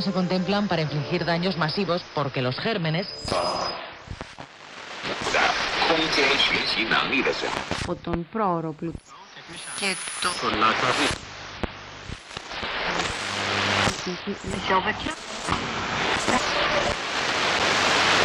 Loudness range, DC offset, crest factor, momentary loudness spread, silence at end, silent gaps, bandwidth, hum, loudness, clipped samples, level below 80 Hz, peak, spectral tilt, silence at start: 5 LU; under 0.1%; 18 dB; 16 LU; 0 s; none; 14.5 kHz; none; -24 LUFS; under 0.1%; -48 dBFS; -6 dBFS; -3.5 dB/octave; 0 s